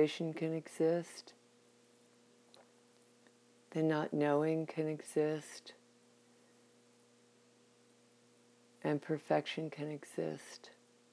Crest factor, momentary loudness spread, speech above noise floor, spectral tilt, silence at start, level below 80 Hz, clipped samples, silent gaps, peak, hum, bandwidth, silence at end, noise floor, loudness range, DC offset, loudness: 22 dB; 19 LU; 31 dB; -6 dB/octave; 0 s; under -90 dBFS; under 0.1%; none; -18 dBFS; none; 11 kHz; 0.45 s; -68 dBFS; 8 LU; under 0.1%; -37 LUFS